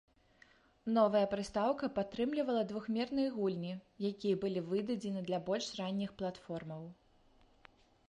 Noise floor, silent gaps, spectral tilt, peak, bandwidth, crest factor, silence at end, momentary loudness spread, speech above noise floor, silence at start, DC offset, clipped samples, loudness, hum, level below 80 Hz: -67 dBFS; none; -6 dB/octave; -18 dBFS; 11 kHz; 20 dB; 1.15 s; 12 LU; 31 dB; 0.85 s; under 0.1%; under 0.1%; -36 LUFS; none; -70 dBFS